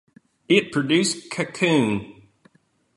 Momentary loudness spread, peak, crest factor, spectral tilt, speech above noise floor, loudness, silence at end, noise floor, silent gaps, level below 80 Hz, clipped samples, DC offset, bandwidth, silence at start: 8 LU; -4 dBFS; 20 dB; -4.5 dB/octave; 40 dB; -21 LUFS; 0.85 s; -62 dBFS; none; -60 dBFS; under 0.1%; under 0.1%; 11.5 kHz; 0.5 s